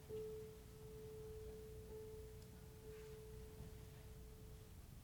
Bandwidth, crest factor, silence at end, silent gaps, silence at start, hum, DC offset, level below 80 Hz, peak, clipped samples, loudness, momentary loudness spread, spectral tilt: over 20 kHz; 14 dB; 0 s; none; 0 s; none; under 0.1%; -62 dBFS; -40 dBFS; under 0.1%; -57 LUFS; 6 LU; -6 dB/octave